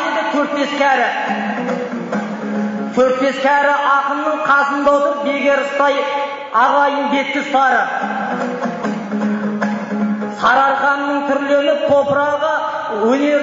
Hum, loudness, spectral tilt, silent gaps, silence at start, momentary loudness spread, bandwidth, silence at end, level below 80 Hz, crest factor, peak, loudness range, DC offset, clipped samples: none; -16 LUFS; -3 dB/octave; none; 0 s; 8 LU; 7.6 kHz; 0 s; -60 dBFS; 14 dB; -2 dBFS; 3 LU; under 0.1%; under 0.1%